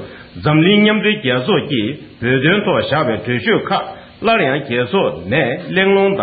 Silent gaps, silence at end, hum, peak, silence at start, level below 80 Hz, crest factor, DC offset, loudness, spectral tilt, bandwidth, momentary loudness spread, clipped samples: none; 0 s; none; 0 dBFS; 0 s; -50 dBFS; 14 dB; under 0.1%; -15 LUFS; -4 dB/octave; 5 kHz; 9 LU; under 0.1%